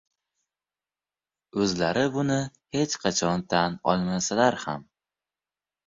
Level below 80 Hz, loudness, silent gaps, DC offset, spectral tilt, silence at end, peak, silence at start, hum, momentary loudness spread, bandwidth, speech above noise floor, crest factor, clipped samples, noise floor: -58 dBFS; -26 LUFS; none; under 0.1%; -4.5 dB/octave; 1.05 s; -6 dBFS; 1.55 s; none; 9 LU; 7.8 kHz; over 65 dB; 22 dB; under 0.1%; under -90 dBFS